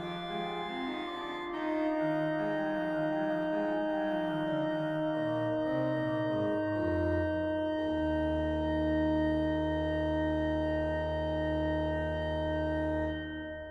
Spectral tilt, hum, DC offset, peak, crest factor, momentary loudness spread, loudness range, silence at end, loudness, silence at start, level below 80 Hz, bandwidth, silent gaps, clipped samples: -8 dB/octave; none; under 0.1%; -20 dBFS; 12 dB; 5 LU; 2 LU; 0 s; -32 LUFS; 0 s; -46 dBFS; 7.4 kHz; none; under 0.1%